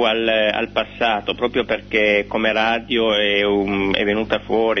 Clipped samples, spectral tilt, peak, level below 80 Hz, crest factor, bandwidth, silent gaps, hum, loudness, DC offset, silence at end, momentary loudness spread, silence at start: under 0.1%; -5.5 dB/octave; -2 dBFS; -44 dBFS; 16 dB; 6.4 kHz; none; 50 Hz at -40 dBFS; -18 LUFS; under 0.1%; 0 s; 5 LU; 0 s